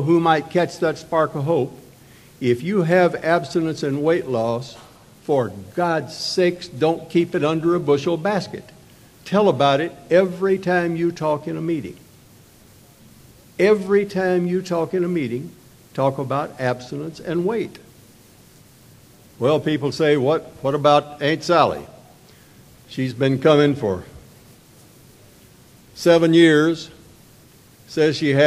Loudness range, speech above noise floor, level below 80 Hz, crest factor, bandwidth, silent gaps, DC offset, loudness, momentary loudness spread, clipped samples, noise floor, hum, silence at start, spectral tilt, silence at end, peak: 5 LU; 30 dB; -58 dBFS; 20 dB; 14.5 kHz; none; under 0.1%; -20 LUFS; 12 LU; under 0.1%; -49 dBFS; none; 0 s; -6.5 dB/octave; 0 s; 0 dBFS